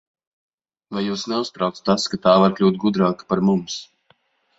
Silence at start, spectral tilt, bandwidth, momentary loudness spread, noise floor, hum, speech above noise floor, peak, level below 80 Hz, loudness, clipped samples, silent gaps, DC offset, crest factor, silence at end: 0.9 s; -6 dB/octave; 8 kHz; 11 LU; -62 dBFS; none; 42 dB; -2 dBFS; -58 dBFS; -20 LUFS; under 0.1%; none; under 0.1%; 20 dB; 0.75 s